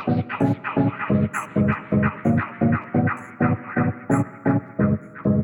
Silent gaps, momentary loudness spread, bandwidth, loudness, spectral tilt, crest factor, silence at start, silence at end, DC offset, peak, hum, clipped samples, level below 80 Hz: none; 3 LU; 17 kHz; -23 LUFS; -8.5 dB/octave; 14 dB; 0 s; 0 s; under 0.1%; -8 dBFS; none; under 0.1%; -48 dBFS